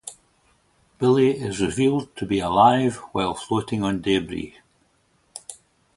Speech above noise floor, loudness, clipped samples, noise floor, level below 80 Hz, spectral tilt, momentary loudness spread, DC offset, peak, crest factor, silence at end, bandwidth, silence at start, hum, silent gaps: 43 dB; -22 LUFS; under 0.1%; -64 dBFS; -52 dBFS; -5.5 dB/octave; 21 LU; under 0.1%; -2 dBFS; 22 dB; 0.4 s; 11.5 kHz; 0.05 s; none; none